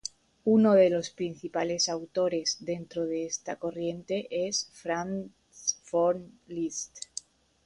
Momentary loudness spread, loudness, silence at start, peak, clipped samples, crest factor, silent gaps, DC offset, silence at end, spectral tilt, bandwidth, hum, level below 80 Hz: 15 LU; -29 LUFS; 0.05 s; -10 dBFS; under 0.1%; 18 dB; none; under 0.1%; 0.65 s; -4 dB/octave; 11 kHz; none; -68 dBFS